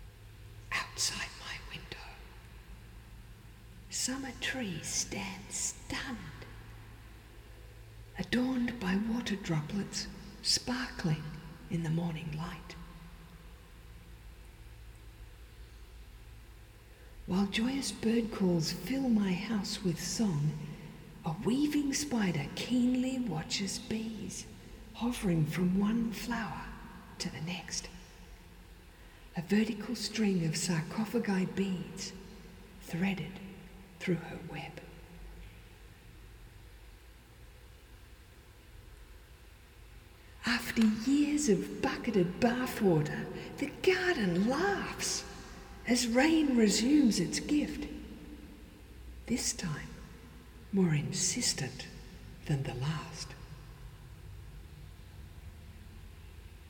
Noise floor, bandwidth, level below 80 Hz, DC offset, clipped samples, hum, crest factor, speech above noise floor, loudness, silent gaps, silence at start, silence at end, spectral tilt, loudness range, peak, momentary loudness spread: -55 dBFS; over 20 kHz; -54 dBFS; under 0.1%; under 0.1%; none; 20 dB; 23 dB; -33 LUFS; none; 0 s; 0 s; -4.5 dB/octave; 13 LU; -14 dBFS; 24 LU